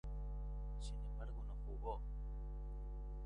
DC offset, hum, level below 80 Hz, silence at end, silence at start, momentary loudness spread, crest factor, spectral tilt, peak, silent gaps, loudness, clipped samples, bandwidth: under 0.1%; 50 Hz at -45 dBFS; -46 dBFS; 0 s; 0.05 s; 3 LU; 14 dB; -7 dB/octave; -32 dBFS; none; -49 LUFS; under 0.1%; 10 kHz